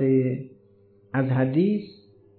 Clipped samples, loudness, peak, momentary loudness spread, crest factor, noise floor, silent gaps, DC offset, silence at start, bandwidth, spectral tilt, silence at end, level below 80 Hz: under 0.1%; -25 LUFS; -12 dBFS; 17 LU; 14 dB; -57 dBFS; none; under 0.1%; 0 s; 4.5 kHz; -12.5 dB/octave; 0.5 s; -70 dBFS